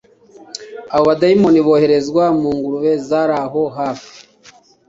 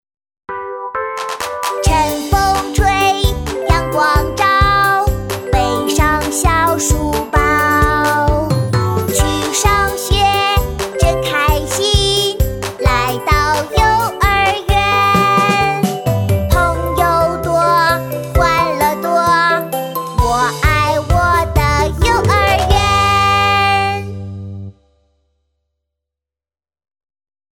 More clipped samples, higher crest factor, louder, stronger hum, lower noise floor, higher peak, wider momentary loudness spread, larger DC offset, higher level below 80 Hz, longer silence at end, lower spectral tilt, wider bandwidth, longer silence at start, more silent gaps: neither; about the same, 14 dB vs 14 dB; about the same, -15 LUFS vs -14 LUFS; neither; second, -47 dBFS vs under -90 dBFS; about the same, -2 dBFS vs 0 dBFS; first, 19 LU vs 8 LU; neither; second, -54 dBFS vs -22 dBFS; second, 0.7 s vs 2.8 s; first, -6.5 dB/octave vs -4 dB/octave; second, 7.8 kHz vs 19 kHz; about the same, 0.55 s vs 0.5 s; neither